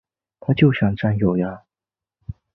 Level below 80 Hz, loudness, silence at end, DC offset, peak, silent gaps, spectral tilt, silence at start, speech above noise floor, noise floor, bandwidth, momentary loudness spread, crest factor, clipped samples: -46 dBFS; -20 LUFS; 0.25 s; under 0.1%; -2 dBFS; none; -10.5 dB/octave; 0.5 s; over 72 dB; under -90 dBFS; 5.4 kHz; 22 LU; 18 dB; under 0.1%